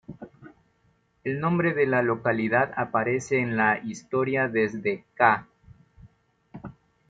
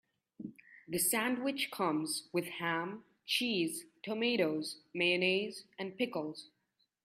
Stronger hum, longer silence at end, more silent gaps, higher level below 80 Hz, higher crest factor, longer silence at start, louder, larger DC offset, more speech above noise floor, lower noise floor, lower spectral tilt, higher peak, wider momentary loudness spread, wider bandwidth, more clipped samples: neither; second, 0.4 s vs 0.6 s; neither; first, -62 dBFS vs -80 dBFS; about the same, 22 dB vs 18 dB; second, 0.1 s vs 0.4 s; first, -25 LUFS vs -34 LUFS; neither; about the same, 42 dB vs 45 dB; second, -67 dBFS vs -80 dBFS; first, -6.5 dB/octave vs -3 dB/octave; first, -6 dBFS vs -18 dBFS; first, 21 LU vs 14 LU; second, 9.2 kHz vs 15.5 kHz; neither